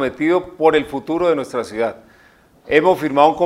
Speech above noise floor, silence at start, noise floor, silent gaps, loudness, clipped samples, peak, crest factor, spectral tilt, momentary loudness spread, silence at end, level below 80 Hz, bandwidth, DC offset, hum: 34 dB; 0 s; -51 dBFS; none; -17 LUFS; under 0.1%; 0 dBFS; 18 dB; -6 dB/octave; 9 LU; 0 s; -52 dBFS; 15 kHz; under 0.1%; none